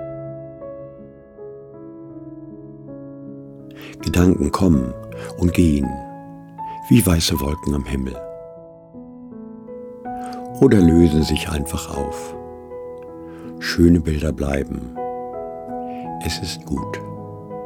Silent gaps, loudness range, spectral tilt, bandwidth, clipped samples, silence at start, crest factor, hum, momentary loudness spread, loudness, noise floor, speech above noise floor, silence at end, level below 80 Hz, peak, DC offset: none; 10 LU; -6 dB/octave; 18 kHz; under 0.1%; 0 s; 20 dB; none; 23 LU; -20 LUFS; -41 dBFS; 23 dB; 0 s; -34 dBFS; -2 dBFS; under 0.1%